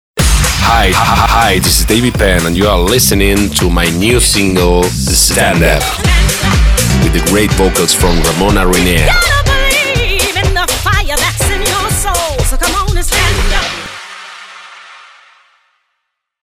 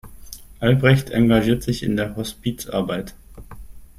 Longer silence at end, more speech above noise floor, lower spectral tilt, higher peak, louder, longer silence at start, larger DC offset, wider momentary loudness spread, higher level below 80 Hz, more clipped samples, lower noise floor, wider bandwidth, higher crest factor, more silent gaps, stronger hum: first, 1.45 s vs 0.15 s; first, 60 dB vs 20 dB; second, -3.5 dB/octave vs -6.5 dB/octave; about the same, 0 dBFS vs -2 dBFS; first, -10 LUFS vs -20 LUFS; about the same, 0.15 s vs 0.05 s; neither; second, 5 LU vs 21 LU; first, -16 dBFS vs -40 dBFS; neither; first, -70 dBFS vs -39 dBFS; first, 18 kHz vs 15.5 kHz; second, 10 dB vs 18 dB; neither; neither